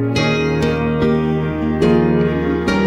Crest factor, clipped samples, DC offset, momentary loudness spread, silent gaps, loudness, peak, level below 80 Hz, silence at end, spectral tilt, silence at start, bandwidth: 12 dB; under 0.1%; under 0.1%; 4 LU; none; -16 LUFS; -4 dBFS; -32 dBFS; 0 s; -7 dB/octave; 0 s; 10 kHz